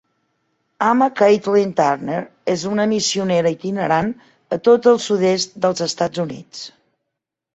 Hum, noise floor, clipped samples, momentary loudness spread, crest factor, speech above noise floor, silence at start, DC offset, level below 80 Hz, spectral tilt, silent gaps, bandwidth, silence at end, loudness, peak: none; -81 dBFS; under 0.1%; 13 LU; 16 dB; 63 dB; 0.8 s; under 0.1%; -60 dBFS; -4.5 dB/octave; none; 8.2 kHz; 0.85 s; -18 LUFS; -2 dBFS